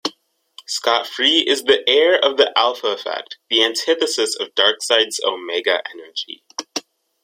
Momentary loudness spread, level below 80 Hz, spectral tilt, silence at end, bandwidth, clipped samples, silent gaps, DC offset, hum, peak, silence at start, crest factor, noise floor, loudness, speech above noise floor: 14 LU; -70 dBFS; 0 dB/octave; 0.45 s; 16 kHz; under 0.1%; none; under 0.1%; none; 0 dBFS; 0.05 s; 18 dB; -50 dBFS; -17 LUFS; 32 dB